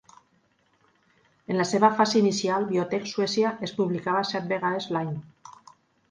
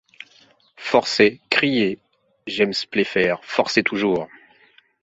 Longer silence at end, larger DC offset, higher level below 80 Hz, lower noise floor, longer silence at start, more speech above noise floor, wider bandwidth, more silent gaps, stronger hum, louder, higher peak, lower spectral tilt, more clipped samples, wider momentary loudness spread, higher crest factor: second, 0.6 s vs 0.75 s; neither; second, -70 dBFS vs -60 dBFS; first, -67 dBFS vs -56 dBFS; first, 1.5 s vs 0.8 s; first, 42 dB vs 36 dB; first, 9.8 kHz vs 8 kHz; neither; neither; second, -25 LUFS vs -20 LUFS; second, -6 dBFS vs -2 dBFS; about the same, -5 dB/octave vs -4.5 dB/octave; neither; second, 8 LU vs 14 LU; about the same, 22 dB vs 20 dB